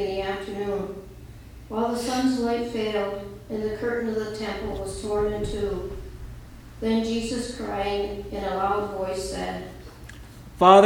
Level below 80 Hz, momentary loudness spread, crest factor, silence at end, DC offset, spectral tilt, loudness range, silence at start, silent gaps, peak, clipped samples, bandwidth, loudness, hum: -42 dBFS; 19 LU; 24 dB; 0 s; under 0.1%; -5.5 dB/octave; 2 LU; 0 s; none; -2 dBFS; under 0.1%; 19.5 kHz; -27 LUFS; none